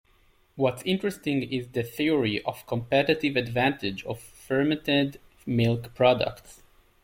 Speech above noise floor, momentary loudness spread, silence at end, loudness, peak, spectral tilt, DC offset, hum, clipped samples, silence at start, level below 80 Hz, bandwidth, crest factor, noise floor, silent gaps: 36 dB; 9 LU; 0.5 s; -26 LUFS; -8 dBFS; -6 dB/octave; under 0.1%; none; under 0.1%; 0.55 s; -56 dBFS; 16.5 kHz; 20 dB; -62 dBFS; none